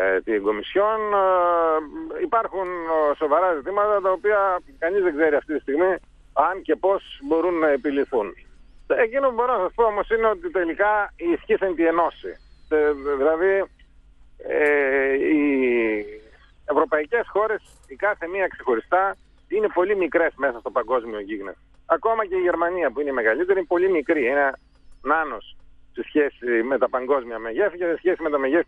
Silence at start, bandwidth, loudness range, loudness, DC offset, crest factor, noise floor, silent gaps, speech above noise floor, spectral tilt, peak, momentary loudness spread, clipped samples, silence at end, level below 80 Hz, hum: 0 s; 5 kHz; 2 LU; -22 LUFS; under 0.1%; 16 dB; -50 dBFS; none; 29 dB; -6.5 dB/octave; -6 dBFS; 8 LU; under 0.1%; 0.05 s; -52 dBFS; none